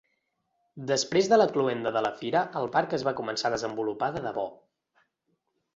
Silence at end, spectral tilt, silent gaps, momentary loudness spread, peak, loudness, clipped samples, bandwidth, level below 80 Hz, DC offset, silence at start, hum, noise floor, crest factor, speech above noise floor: 1.2 s; -4 dB/octave; none; 10 LU; -8 dBFS; -27 LUFS; under 0.1%; 8 kHz; -66 dBFS; under 0.1%; 0.75 s; none; -77 dBFS; 20 dB; 50 dB